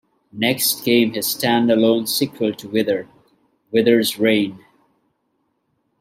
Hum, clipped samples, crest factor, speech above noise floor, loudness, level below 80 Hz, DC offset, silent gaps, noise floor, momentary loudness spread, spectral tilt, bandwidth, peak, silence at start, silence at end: none; under 0.1%; 18 dB; 51 dB; -18 LUFS; -66 dBFS; under 0.1%; none; -69 dBFS; 7 LU; -4 dB/octave; 16 kHz; -2 dBFS; 0.35 s; 1.45 s